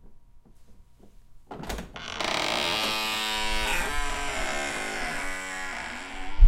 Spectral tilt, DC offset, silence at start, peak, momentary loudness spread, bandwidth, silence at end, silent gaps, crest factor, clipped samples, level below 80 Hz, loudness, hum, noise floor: -2.5 dB/octave; under 0.1%; 0.05 s; -4 dBFS; 11 LU; 16.5 kHz; 0 s; none; 22 dB; under 0.1%; -34 dBFS; -29 LUFS; none; -51 dBFS